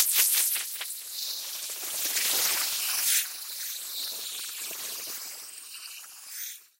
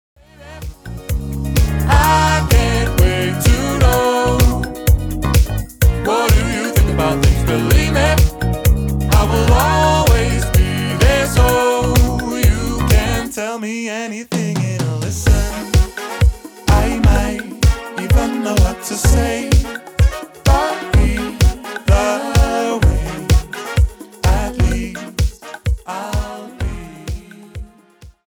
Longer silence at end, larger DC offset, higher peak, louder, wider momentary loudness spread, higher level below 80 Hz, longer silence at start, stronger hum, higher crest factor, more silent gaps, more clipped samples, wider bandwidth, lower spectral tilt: about the same, 0.15 s vs 0.15 s; neither; second, -8 dBFS vs -2 dBFS; second, -28 LUFS vs -16 LUFS; first, 16 LU vs 10 LU; second, -86 dBFS vs -18 dBFS; second, 0 s vs 0.4 s; neither; first, 24 dB vs 12 dB; neither; neither; second, 16 kHz vs 20 kHz; second, 3.5 dB/octave vs -5.5 dB/octave